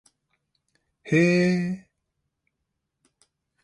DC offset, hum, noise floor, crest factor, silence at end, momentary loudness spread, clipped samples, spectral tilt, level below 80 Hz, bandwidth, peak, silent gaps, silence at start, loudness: under 0.1%; none; -80 dBFS; 20 dB; 1.85 s; 13 LU; under 0.1%; -7 dB/octave; -68 dBFS; 11 kHz; -8 dBFS; none; 1.05 s; -22 LUFS